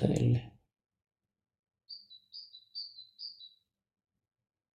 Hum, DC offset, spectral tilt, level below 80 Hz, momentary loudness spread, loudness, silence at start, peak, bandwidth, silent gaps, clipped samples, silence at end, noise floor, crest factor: none; under 0.1%; -7 dB/octave; -60 dBFS; 21 LU; -35 LUFS; 0 s; -12 dBFS; 10 kHz; 1.59-1.63 s; under 0.1%; 1.25 s; -63 dBFS; 26 dB